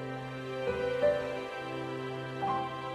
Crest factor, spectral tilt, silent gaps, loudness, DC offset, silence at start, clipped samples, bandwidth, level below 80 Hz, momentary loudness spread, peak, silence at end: 18 dB; -6 dB/octave; none; -34 LUFS; under 0.1%; 0 s; under 0.1%; 13 kHz; -60 dBFS; 9 LU; -16 dBFS; 0 s